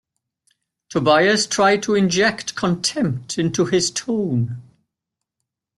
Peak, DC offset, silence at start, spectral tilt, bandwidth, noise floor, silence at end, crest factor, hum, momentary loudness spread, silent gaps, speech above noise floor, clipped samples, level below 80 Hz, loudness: -4 dBFS; under 0.1%; 0.9 s; -4 dB/octave; 12 kHz; -83 dBFS; 1.15 s; 18 dB; none; 8 LU; none; 64 dB; under 0.1%; -58 dBFS; -19 LUFS